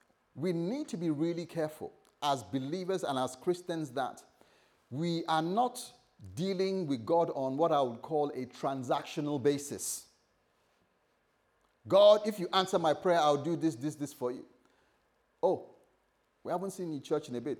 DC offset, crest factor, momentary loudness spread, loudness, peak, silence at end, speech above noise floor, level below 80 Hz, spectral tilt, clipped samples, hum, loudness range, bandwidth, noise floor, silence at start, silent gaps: under 0.1%; 22 dB; 10 LU; -32 LUFS; -12 dBFS; 0 s; 42 dB; -82 dBFS; -5 dB/octave; under 0.1%; none; 8 LU; 19 kHz; -74 dBFS; 0.35 s; none